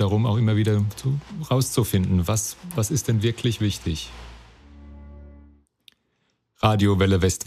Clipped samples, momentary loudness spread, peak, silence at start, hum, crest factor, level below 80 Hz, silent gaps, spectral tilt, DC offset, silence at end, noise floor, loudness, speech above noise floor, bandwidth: under 0.1%; 10 LU; -4 dBFS; 0 s; none; 20 dB; -46 dBFS; none; -5.5 dB/octave; under 0.1%; 0.05 s; -71 dBFS; -23 LUFS; 50 dB; 15.5 kHz